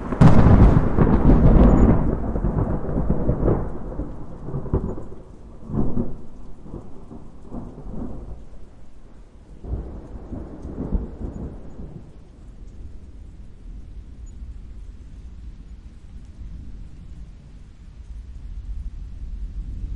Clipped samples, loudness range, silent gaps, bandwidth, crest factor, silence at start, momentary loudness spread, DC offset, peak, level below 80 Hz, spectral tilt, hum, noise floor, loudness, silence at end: under 0.1%; 23 LU; none; 7.2 kHz; 18 dB; 0 s; 28 LU; under 0.1%; -4 dBFS; -26 dBFS; -10 dB/octave; none; -42 dBFS; -21 LUFS; 0 s